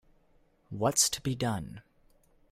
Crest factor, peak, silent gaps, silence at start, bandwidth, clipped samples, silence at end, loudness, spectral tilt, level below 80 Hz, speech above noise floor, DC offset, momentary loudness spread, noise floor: 22 dB; -12 dBFS; none; 0.7 s; 16 kHz; under 0.1%; 0.7 s; -29 LUFS; -3 dB/octave; -60 dBFS; 36 dB; under 0.1%; 19 LU; -66 dBFS